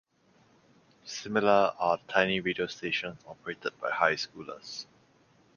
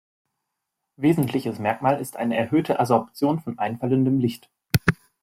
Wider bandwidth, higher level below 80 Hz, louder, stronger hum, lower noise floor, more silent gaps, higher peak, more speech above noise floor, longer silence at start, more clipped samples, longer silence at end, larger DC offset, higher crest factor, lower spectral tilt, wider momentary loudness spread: second, 7.2 kHz vs 16.5 kHz; second, -68 dBFS vs -54 dBFS; second, -29 LUFS vs -23 LUFS; neither; second, -65 dBFS vs -81 dBFS; neither; second, -8 dBFS vs 0 dBFS; second, 35 dB vs 59 dB; about the same, 1.05 s vs 1 s; neither; first, 0.75 s vs 0.3 s; neither; about the same, 24 dB vs 22 dB; second, -4 dB/octave vs -7 dB/octave; first, 17 LU vs 5 LU